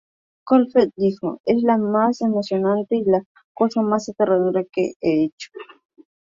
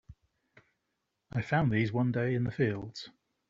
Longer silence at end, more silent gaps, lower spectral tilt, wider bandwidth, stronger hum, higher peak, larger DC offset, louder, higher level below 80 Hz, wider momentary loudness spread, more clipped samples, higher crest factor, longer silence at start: first, 0.65 s vs 0.4 s; first, 1.40-1.44 s, 3.26-3.35 s, 3.44-3.55 s, 4.96-5.00 s, 5.32-5.38 s vs none; about the same, -7 dB/octave vs -6.5 dB/octave; about the same, 7.6 kHz vs 7.4 kHz; neither; first, -4 dBFS vs -14 dBFS; neither; first, -20 LUFS vs -31 LUFS; about the same, -62 dBFS vs -60 dBFS; second, 6 LU vs 15 LU; neither; about the same, 16 dB vs 20 dB; first, 0.45 s vs 0.1 s